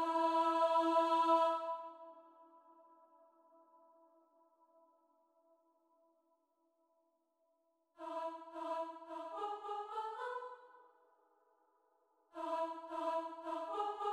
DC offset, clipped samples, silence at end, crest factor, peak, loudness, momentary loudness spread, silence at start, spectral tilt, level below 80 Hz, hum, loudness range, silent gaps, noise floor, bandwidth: under 0.1%; under 0.1%; 0 s; 20 dB; -20 dBFS; -38 LUFS; 18 LU; 0 s; -2.5 dB/octave; under -90 dBFS; none; 17 LU; none; -81 dBFS; 12 kHz